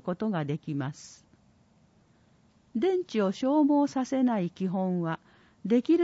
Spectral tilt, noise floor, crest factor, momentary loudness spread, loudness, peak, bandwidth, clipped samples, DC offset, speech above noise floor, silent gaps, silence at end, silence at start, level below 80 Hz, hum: -7.5 dB/octave; -63 dBFS; 14 dB; 13 LU; -28 LUFS; -14 dBFS; 8 kHz; under 0.1%; under 0.1%; 36 dB; none; 0 s; 0.05 s; -72 dBFS; none